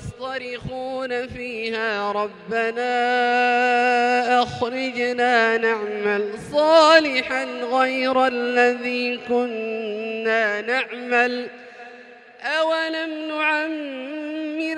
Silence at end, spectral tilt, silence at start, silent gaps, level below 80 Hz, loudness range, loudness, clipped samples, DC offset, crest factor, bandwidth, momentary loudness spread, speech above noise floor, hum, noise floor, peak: 0 s; -4 dB/octave; 0 s; none; -58 dBFS; 6 LU; -21 LUFS; under 0.1%; under 0.1%; 20 dB; 11 kHz; 12 LU; 23 dB; none; -44 dBFS; 0 dBFS